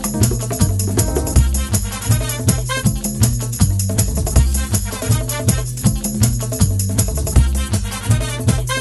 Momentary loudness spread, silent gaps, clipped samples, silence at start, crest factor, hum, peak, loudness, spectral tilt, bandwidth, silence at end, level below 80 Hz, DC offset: 3 LU; none; under 0.1%; 0 s; 16 dB; none; 0 dBFS; -18 LUFS; -4.5 dB/octave; 13 kHz; 0 s; -22 dBFS; under 0.1%